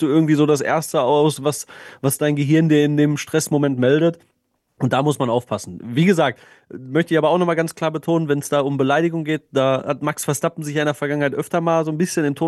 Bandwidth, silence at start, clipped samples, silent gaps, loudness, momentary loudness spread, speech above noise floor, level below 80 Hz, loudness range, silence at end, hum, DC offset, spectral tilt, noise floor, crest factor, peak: 13 kHz; 0 s; under 0.1%; none; -19 LUFS; 8 LU; 50 dB; -64 dBFS; 2 LU; 0 s; none; under 0.1%; -6 dB/octave; -68 dBFS; 14 dB; -4 dBFS